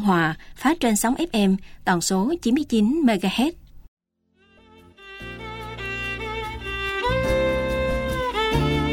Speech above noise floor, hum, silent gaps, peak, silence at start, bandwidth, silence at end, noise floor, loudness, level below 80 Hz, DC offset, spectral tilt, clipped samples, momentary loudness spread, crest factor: 43 dB; none; 3.88-3.97 s; -6 dBFS; 0 s; 17 kHz; 0 s; -64 dBFS; -23 LUFS; -38 dBFS; under 0.1%; -5 dB/octave; under 0.1%; 11 LU; 16 dB